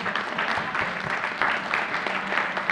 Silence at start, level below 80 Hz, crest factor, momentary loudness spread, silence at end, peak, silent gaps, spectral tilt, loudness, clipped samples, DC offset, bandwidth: 0 s; -60 dBFS; 20 dB; 3 LU; 0 s; -8 dBFS; none; -3.5 dB/octave; -25 LUFS; under 0.1%; under 0.1%; 15 kHz